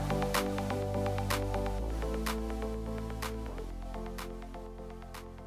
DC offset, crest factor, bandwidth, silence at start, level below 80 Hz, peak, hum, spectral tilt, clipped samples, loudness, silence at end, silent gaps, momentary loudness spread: under 0.1%; 18 dB; 16 kHz; 0 s; -40 dBFS; -16 dBFS; none; -5.5 dB/octave; under 0.1%; -36 LUFS; 0 s; none; 14 LU